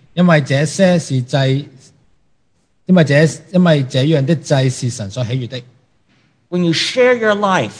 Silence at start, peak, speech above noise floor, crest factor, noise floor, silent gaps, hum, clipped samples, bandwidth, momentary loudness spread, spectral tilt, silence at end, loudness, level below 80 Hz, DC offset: 0.15 s; 0 dBFS; 49 dB; 16 dB; -63 dBFS; none; none; under 0.1%; 10.5 kHz; 10 LU; -6 dB/octave; 0 s; -14 LUFS; -58 dBFS; under 0.1%